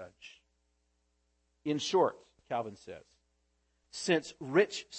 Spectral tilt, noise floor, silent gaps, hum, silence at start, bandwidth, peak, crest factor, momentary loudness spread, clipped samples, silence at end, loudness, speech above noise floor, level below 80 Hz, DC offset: -4 dB/octave; -77 dBFS; none; none; 0 s; 8.8 kHz; -14 dBFS; 22 dB; 21 LU; under 0.1%; 0 s; -32 LUFS; 44 dB; -76 dBFS; under 0.1%